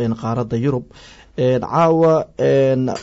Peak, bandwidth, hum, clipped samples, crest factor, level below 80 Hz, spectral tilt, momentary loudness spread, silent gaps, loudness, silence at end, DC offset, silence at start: -6 dBFS; 8 kHz; none; under 0.1%; 12 dB; -50 dBFS; -8 dB/octave; 8 LU; none; -17 LUFS; 0 s; under 0.1%; 0 s